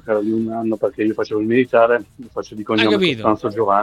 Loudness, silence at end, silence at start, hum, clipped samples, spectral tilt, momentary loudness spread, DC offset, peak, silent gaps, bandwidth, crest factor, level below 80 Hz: -18 LUFS; 0 s; 0.05 s; none; under 0.1%; -6.5 dB/octave; 11 LU; under 0.1%; 0 dBFS; none; 11 kHz; 18 dB; -56 dBFS